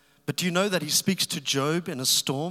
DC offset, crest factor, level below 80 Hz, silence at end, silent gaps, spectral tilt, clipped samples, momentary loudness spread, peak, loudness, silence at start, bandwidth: under 0.1%; 18 dB; -76 dBFS; 0 s; none; -3 dB/octave; under 0.1%; 5 LU; -10 dBFS; -25 LUFS; 0.3 s; 16.5 kHz